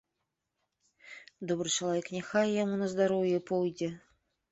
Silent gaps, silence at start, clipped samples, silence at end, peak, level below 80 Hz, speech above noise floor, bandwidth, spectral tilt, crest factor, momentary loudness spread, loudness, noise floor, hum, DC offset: none; 1.05 s; under 0.1%; 0.55 s; -16 dBFS; -72 dBFS; 54 dB; 8.2 kHz; -4.5 dB/octave; 18 dB; 20 LU; -31 LUFS; -84 dBFS; none; under 0.1%